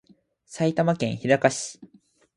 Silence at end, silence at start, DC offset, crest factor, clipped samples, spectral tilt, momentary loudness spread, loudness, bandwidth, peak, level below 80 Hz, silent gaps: 0.5 s; 0.5 s; under 0.1%; 22 dB; under 0.1%; -5 dB/octave; 13 LU; -24 LUFS; 11.5 kHz; -4 dBFS; -64 dBFS; none